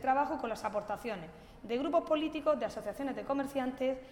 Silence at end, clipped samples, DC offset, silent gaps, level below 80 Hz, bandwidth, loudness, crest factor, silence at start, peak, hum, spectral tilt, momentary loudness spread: 0 s; under 0.1%; under 0.1%; none; -62 dBFS; 17 kHz; -35 LUFS; 16 dB; 0 s; -18 dBFS; none; -5.5 dB/octave; 9 LU